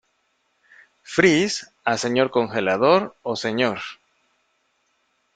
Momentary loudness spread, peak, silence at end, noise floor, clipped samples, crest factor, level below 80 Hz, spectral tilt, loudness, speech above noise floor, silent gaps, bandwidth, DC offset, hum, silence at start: 9 LU; -2 dBFS; 1.4 s; -69 dBFS; under 0.1%; 22 dB; -62 dBFS; -4.5 dB/octave; -21 LUFS; 48 dB; none; 9.4 kHz; under 0.1%; none; 1.1 s